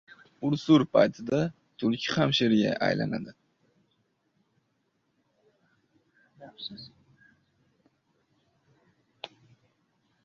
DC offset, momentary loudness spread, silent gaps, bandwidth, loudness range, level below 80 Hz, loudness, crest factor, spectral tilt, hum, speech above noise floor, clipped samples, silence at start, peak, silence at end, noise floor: under 0.1%; 23 LU; none; 7.4 kHz; 23 LU; -66 dBFS; -26 LUFS; 22 dB; -6 dB/octave; none; 49 dB; under 0.1%; 0.4 s; -8 dBFS; 1 s; -75 dBFS